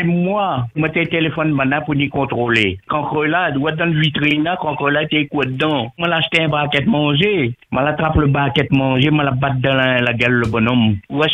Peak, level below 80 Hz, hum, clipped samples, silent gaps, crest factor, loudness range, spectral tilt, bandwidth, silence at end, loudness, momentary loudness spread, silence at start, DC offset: 0 dBFS; -40 dBFS; none; under 0.1%; none; 16 dB; 2 LU; -7.5 dB/octave; 9 kHz; 0 s; -16 LUFS; 4 LU; 0 s; under 0.1%